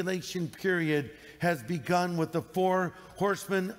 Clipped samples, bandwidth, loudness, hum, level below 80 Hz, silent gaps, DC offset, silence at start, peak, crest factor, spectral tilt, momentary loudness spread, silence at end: under 0.1%; 16 kHz; -30 LUFS; none; -66 dBFS; none; under 0.1%; 0 s; -16 dBFS; 14 dB; -5.5 dB/octave; 5 LU; 0 s